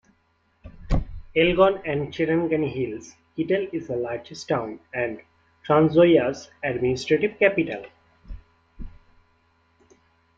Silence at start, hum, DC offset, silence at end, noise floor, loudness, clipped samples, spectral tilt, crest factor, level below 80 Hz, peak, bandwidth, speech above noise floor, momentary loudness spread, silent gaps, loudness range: 0.65 s; none; under 0.1%; 1.5 s; -66 dBFS; -23 LUFS; under 0.1%; -6.5 dB/octave; 20 dB; -40 dBFS; -4 dBFS; 7.8 kHz; 44 dB; 14 LU; none; 5 LU